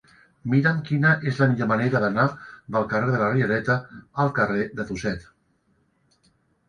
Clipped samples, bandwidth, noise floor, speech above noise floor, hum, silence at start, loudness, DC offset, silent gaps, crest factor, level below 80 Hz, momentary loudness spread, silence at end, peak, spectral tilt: under 0.1%; 9.8 kHz; -66 dBFS; 44 dB; none; 0.45 s; -23 LUFS; under 0.1%; none; 20 dB; -56 dBFS; 9 LU; 1.45 s; -4 dBFS; -8 dB/octave